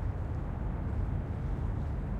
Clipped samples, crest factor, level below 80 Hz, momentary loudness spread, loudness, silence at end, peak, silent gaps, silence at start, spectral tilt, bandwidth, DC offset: under 0.1%; 12 dB; -36 dBFS; 2 LU; -36 LUFS; 0 s; -22 dBFS; none; 0 s; -10 dB/octave; 4.8 kHz; under 0.1%